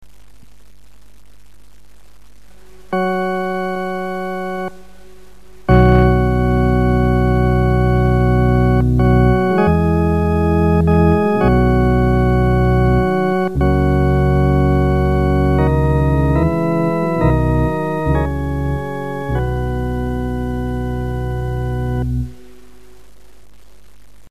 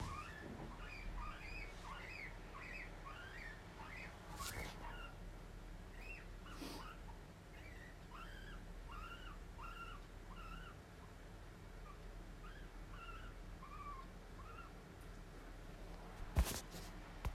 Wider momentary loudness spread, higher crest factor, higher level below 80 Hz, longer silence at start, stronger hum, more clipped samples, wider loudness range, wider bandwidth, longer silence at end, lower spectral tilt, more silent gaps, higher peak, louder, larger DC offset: about the same, 9 LU vs 8 LU; second, 16 dB vs 28 dB; first, -22 dBFS vs -52 dBFS; first, 2.9 s vs 0 s; neither; neither; first, 10 LU vs 6 LU; second, 13 kHz vs 16 kHz; about the same, 0 s vs 0 s; first, -9 dB/octave vs -4.5 dB/octave; neither; first, 0 dBFS vs -24 dBFS; first, -16 LUFS vs -52 LUFS; first, 2% vs under 0.1%